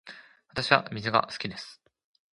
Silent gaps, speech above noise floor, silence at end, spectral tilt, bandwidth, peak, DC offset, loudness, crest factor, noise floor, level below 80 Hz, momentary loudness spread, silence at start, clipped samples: none; 23 dB; 0.6 s; -4.5 dB/octave; 11.5 kHz; -2 dBFS; under 0.1%; -27 LUFS; 28 dB; -50 dBFS; -62 dBFS; 19 LU; 0.05 s; under 0.1%